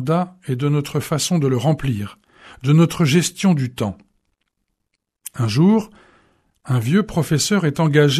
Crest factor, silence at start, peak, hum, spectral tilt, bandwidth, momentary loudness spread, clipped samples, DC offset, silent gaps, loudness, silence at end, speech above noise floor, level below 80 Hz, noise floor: 16 dB; 0 s; -2 dBFS; none; -5.5 dB/octave; 13.5 kHz; 11 LU; under 0.1%; under 0.1%; none; -19 LUFS; 0 s; 57 dB; -48 dBFS; -75 dBFS